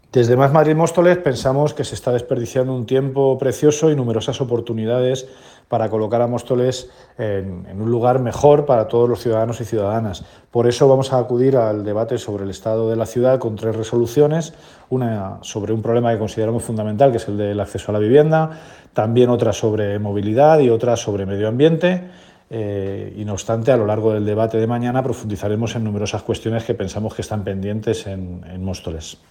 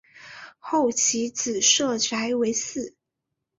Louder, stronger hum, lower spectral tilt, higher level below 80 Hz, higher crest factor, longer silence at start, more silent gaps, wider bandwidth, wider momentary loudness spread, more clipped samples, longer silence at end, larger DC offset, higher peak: first, -18 LUFS vs -22 LUFS; neither; first, -6.5 dB/octave vs -1 dB/octave; first, -50 dBFS vs -66 dBFS; about the same, 18 dB vs 20 dB; about the same, 0.15 s vs 0.15 s; neither; first, 17 kHz vs 7.8 kHz; second, 12 LU vs 20 LU; neither; second, 0.15 s vs 0.7 s; neither; first, 0 dBFS vs -6 dBFS